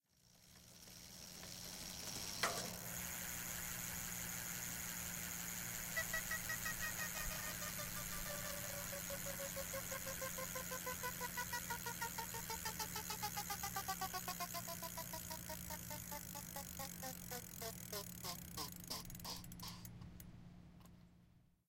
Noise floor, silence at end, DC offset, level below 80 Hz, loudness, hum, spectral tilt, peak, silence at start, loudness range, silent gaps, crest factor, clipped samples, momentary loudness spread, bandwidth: -70 dBFS; 0.25 s; under 0.1%; -62 dBFS; -45 LUFS; none; -2 dB/octave; -24 dBFS; 0.25 s; 5 LU; none; 24 dB; under 0.1%; 11 LU; 17 kHz